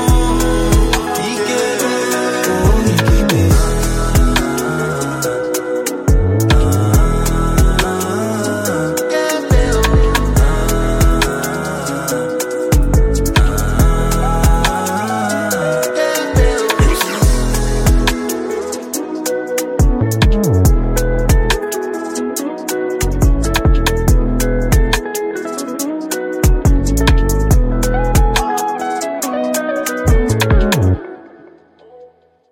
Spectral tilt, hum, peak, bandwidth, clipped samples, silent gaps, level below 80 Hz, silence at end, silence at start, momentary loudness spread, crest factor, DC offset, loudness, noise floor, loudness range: -5 dB/octave; none; 0 dBFS; 17 kHz; under 0.1%; none; -16 dBFS; 0.45 s; 0 s; 7 LU; 14 dB; under 0.1%; -15 LUFS; -45 dBFS; 2 LU